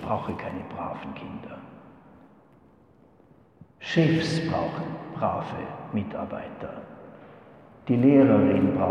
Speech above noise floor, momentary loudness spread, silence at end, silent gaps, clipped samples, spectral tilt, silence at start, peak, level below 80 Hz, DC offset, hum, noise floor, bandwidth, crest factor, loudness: 32 dB; 22 LU; 0 s; none; under 0.1%; -7.5 dB/octave; 0 s; -6 dBFS; -58 dBFS; under 0.1%; none; -57 dBFS; 9.4 kHz; 20 dB; -25 LUFS